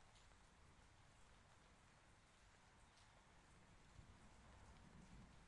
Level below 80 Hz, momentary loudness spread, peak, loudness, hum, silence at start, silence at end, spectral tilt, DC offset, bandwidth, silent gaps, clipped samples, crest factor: -74 dBFS; 3 LU; -52 dBFS; -67 LUFS; none; 0 s; 0 s; -4 dB/octave; under 0.1%; 11 kHz; none; under 0.1%; 16 dB